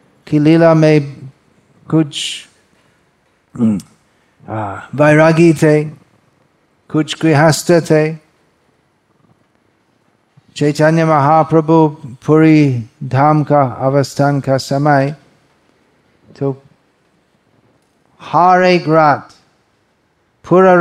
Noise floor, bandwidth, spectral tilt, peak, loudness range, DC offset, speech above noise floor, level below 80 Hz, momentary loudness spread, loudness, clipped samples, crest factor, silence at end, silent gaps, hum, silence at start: -59 dBFS; 13.5 kHz; -6.5 dB/octave; 0 dBFS; 9 LU; under 0.1%; 48 dB; -56 dBFS; 14 LU; -12 LUFS; under 0.1%; 14 dB; 0 s; none; none; 0.3 s